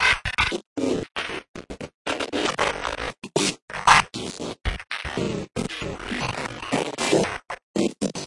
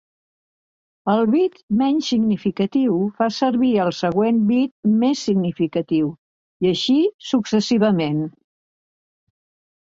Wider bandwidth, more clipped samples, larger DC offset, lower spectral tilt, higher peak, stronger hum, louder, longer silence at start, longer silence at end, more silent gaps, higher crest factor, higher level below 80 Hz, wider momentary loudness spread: first, 11.5 kHz vs 7.6 kHz; neither; neither; second, -3.5 dB/octave vs -6.5 dB/octave; first, 0 dBFS vs -4 dBFS; neither; second, -25 LUFS vs -19 LUFS; second, 0 s vs 1.05 s; second, 0 s vs 1.5 s; second, 0.67-0.76 s, 1.48-1.54 s, 1.94-2.05 s, 3.62-3.68 s, 7.63-7.74 s vs 1.63-1.68 s, 4.71-4.83 s, 6.18-6.60 s, 7.14-7.19 s; first, 24 dB vs 16 dB; first, -42 dBFS vs -60 dBFS; first, 12 LU vs 5 LU